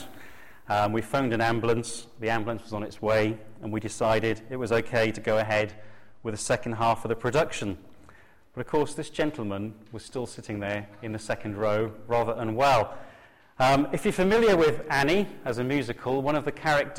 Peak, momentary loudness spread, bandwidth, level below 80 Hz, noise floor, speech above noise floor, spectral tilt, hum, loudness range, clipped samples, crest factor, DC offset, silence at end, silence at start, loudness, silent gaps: -14 dBFS; 13 LU; 16 kHz; -50 dBFS; -56 dBFS; 29 dB; -5.5 dB/octave; none; 7 LU; under 0.1%; 14 dB; under 0.1%; 0 s; 0 s; -27 LUFS; none